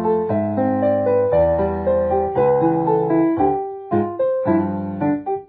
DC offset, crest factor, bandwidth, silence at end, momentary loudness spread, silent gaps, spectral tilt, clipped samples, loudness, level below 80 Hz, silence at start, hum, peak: under 0.1%; 12 dB; 4.5 kHz; 0.05 s; 5 LU; none; -13 dB/octave; under 0.1%; -19 LUFS; -42 dBFS; 0 s; none; -6 dBFS